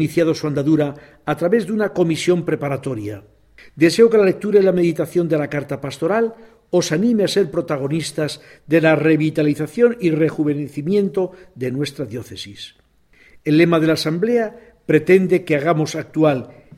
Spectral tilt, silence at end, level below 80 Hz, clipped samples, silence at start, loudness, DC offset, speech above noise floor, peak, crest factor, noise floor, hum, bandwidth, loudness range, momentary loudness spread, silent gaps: -6.5 dB/octave; 0.25 s; -56 dBFS; under 0.1%; 0 s; -18 LUFS; under 0.1%; 35 dB; -2 dBFS; 16 dB; -53 dBFS; none; 14.5 kHz; 4 LU; 13 LU; none